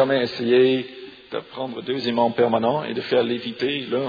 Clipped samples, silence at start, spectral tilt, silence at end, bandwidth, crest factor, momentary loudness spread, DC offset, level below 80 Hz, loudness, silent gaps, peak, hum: under 0.1%; 0 s; -7 dB/octave; 0 s; 5 kHz; 16 dB; 15 LU; under 0.1%; -66 dBFS; -22 LUFS; none; -6 dBFS; none